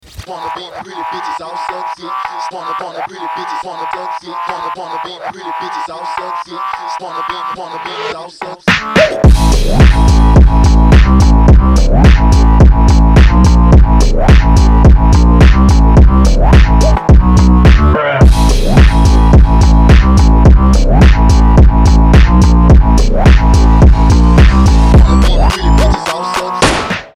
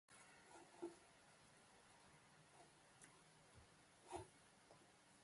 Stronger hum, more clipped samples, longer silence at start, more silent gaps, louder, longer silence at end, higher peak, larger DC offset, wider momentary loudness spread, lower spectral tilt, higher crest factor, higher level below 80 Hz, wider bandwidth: neither; neither; about the same, 0.2 s vs 0.1 s; neither; first, -8 LUFS vs -64 LUFS; about the same, 0.1 s vs 0 s; first, 0 dBFS vs -38 dBFS; neither; first, 14 LU vs 11 LU; first, -6.5 dB/octave vs -4 dB/octave; second, 6 dB vs 26 dB; first, -8 dBFS vs -82 dBFS; about the same, 11 kHz vs 11.5 kHz